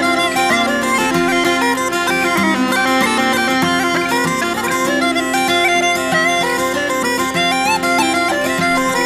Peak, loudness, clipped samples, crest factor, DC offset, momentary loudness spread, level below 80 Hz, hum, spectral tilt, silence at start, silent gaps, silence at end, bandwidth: -2 dBFS; -15 LUFS; under 0.1%; 12 dB; under 0.1%; 3 LU; -46 dBFS; none; -3 dB/octave; 0 s; none; 0 s; 16 kHz